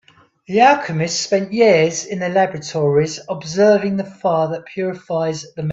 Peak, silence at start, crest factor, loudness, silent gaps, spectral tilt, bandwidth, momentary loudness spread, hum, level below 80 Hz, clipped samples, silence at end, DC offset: 0 dBFS; 0.5 s; 16 dB; -17 LUFS; none; -5 dB/octave; 8 kHz; 11 LU; none; -60 dBFS; under 0.1%; 0 s; under 0.1%